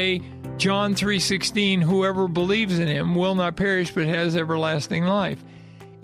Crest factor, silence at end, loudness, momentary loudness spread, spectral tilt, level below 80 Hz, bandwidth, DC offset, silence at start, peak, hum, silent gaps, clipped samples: 14 dB; 0.05 s; -22 LUFS; 4 LU; -5 dB/octave; -52 dBFS; 14 kHz; under 0.1%; 0 s; -8 dBFS; none; none; under 0.1%